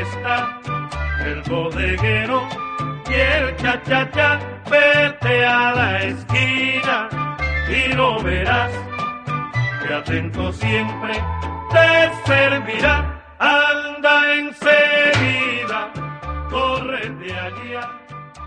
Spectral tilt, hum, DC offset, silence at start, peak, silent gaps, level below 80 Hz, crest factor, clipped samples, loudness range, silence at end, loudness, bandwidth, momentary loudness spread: -5.5 dB/octave; none; under 0.1%; 0 s; -2 dBFS; none; -34 dBFS; 18 dB; under 0.1%; 5 LU; 0 s; -18 LUFS; 10 kHz; 13 LU